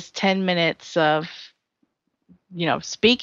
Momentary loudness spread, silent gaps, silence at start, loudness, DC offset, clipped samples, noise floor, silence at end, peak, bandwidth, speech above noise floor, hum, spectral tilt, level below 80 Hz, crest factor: 16 LU; none; 0 s; -22 LUFS; under 0.1%; under 0.1%; -72 dBFS; 0 s; -2 dBFS; 7.6 kHz; 50 dB; none; -4.5 dB/octave; -60 dBFS; 20 dB